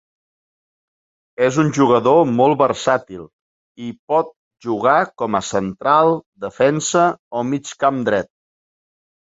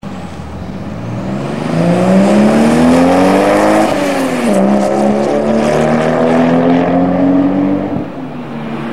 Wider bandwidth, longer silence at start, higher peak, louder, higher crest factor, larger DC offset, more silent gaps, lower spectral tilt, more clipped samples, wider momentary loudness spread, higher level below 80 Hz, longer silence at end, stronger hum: second, 8 kHz vs 14 kHz; first, 1.4 s vs 0 s; about the same, -2 dBFS vs 0 dBFS; second, -17 LUFS vs -11 LUFS; first, 18 dB vs 12 dB; second, under 0.1% vs 2%; first, 3.33-3.75 s, 3.99-4.08 s, 4.36-4.51 s, 6.26-6.32 s, 7.19-7.31 s vs none; about the same, -5.5 dB/octave vs -6.5 dB/octave; neither; first, 18 LU vs 15 LU; second, -58 dBFS vs -38 dBFS; first, 1.05 s vs 0 s; neither